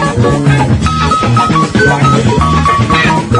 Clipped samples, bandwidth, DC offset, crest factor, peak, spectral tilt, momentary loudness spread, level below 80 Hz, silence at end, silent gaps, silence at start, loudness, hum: 0.2%; 11 kHz; under 0.1%; 8 dB; 0 dBFS; -6 dB/octave; 2 LU; -26 dBFS; 0 s; none; 0 s; -9 LUFS; none